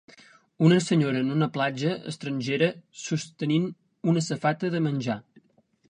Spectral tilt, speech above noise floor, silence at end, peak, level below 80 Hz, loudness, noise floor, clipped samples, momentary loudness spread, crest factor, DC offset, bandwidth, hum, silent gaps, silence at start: -6 dB/octave; 37 dB; 0.7 s; -8 dBFS; -70 dBFS; -26 LUFS; -62 dBFS; under 0.1%; 11 LU; 18 dB; under 0.1%; 10 kHz; none; none; 0.6 s